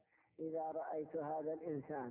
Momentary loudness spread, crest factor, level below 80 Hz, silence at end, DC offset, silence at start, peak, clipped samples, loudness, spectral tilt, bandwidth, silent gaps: 2 LU; 12 dB; -84 dBFS; 0 s; under 0.1%; 0.4 s; -32 dBFS; under 0.1%; -44 LUFS; -4 dB/octave; 3.1 kHz; none